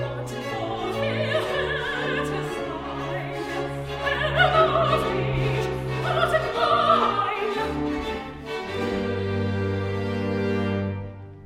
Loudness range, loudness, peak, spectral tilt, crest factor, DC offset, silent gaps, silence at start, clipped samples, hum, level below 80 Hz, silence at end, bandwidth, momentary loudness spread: 5 LU; -25 LUFS; -6 dBFS; -6 dB/octave; 20 dB; under 0.1%; none; 0 s; under 0.1%; none; -44 dBFS; 0 s; 15.5 kHz; 11 LU